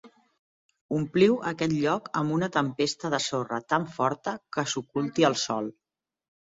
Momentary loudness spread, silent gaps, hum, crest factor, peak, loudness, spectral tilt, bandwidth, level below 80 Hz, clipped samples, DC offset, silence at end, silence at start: 9 LU; 0.39-0.69 s, 0.81-0.89 s; none; 22 dB; -6 dBFS; -27 LUFS; -5 dB/octave; 8 kHz; -66 dBFS; under 0.1%; under 0.1%; 0.8 s; 0.05 s